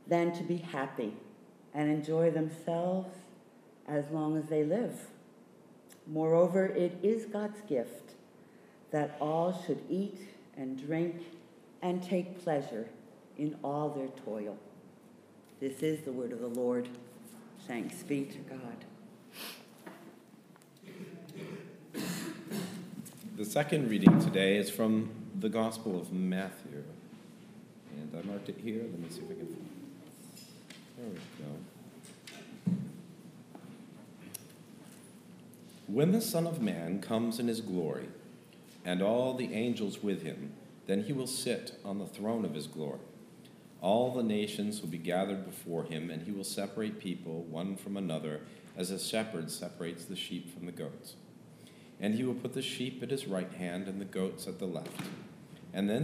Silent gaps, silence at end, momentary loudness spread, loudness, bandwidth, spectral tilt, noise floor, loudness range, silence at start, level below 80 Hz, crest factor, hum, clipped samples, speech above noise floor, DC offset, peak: none; 0 s; 22 LU; -35 LUFS; 15.5 kHz; -6 dB/octave; -58 dBFS; 12 LU; 0 s; -76 dBFS; 32 dB; none; under 0.1%; 25 dB; under 0.1%; -4 dBFS